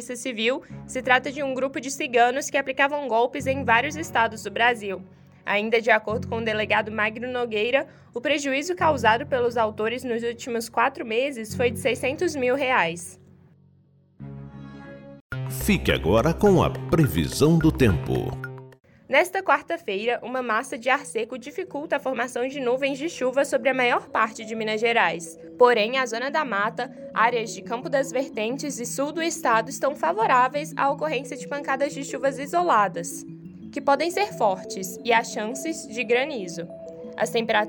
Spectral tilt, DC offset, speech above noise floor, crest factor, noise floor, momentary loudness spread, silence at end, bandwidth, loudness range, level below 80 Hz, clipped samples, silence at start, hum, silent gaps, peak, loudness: -4.5 dB/octave; under 0.1%; 35 dB; 22 dB; -59 dBFS; 13 LU; 0 s; 17 kHz; 4 LU; -46 dBFS; under 0.1%; 0 s; none; 15.21-15.30 s; -2 dBFS; -24 LUFS